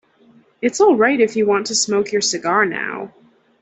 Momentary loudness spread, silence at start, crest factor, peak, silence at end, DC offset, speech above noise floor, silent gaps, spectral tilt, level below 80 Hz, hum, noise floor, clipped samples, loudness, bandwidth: 11 LU; 0.6 s; 16 dB; -2 dBFS; 0.55 s; under 0.1%; 35 dB; none; -2.5 dB/octave; -62 dBFS; none; -52 dBFS; under 0.1%; -17 LUFS; 8.4 kHz